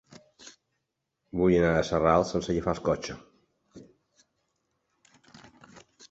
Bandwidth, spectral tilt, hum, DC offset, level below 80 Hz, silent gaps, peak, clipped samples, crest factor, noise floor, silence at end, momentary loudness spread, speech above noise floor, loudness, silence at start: 8 kHz; -6.5 dB/octave; none; under 0.1%; -50 dBFS; none; -8 dBFS; under 0.1%; 22 dB; -82 dBFS; 0.05 s; 16 LU; 57 dB; -26 LUFS; 0.45 s